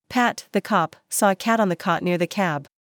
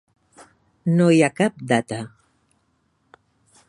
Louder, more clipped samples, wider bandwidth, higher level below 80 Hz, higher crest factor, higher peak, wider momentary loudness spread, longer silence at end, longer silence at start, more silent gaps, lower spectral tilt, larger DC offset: about the same, -22 LUFS vs -20 LUFS; neither; first, over 20 kHz vs 11 kHz; about the same, -70 dBFS vs -66 dBFS; about the same, 16 dB vs 20 dB; second, -6 dBFS vs -2 dBFS; second, 5 LU vs 16 LU; second, 0.35 s vs 1.6 s; second, 0.1 s vs 0.85 s; neither; second, -4.5 dB/octave vs -6.5 dB/octave; neither